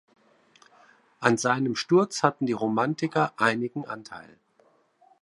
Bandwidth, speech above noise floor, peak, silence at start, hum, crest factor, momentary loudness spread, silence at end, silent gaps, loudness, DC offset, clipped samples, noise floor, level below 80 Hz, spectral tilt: 11.5 kHz; 38 dB; -4 dBFS; 1.2 s; none; 24 dB; 14 LU; 1 s; none; -25 LUFS; under 0.1%; under 0.1%; -64 dBFS; -74 dBFS; -5 dB/octave